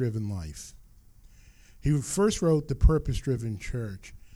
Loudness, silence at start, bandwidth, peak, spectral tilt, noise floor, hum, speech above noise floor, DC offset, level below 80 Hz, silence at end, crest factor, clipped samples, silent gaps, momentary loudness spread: -28 LUFS; 0 s; 15.5 kHz; -8 dBFS; -6.5 dB/octave; -54 dBFS; none; 27 dB; under 0.1%; -34 dBFS; 0.1 s; 20 dB; under 0.1%; none; 16 LU